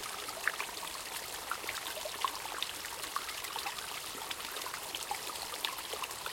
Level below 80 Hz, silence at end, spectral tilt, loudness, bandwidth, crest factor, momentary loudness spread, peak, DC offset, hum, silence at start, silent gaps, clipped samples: -68 dBFS; 0 s; 0 dB/octave; -38 LUFS; 17 kHz; 26 dB; 3 LU; -14 dBFS; under 0.1%; none; 0 s; none; under 0.1%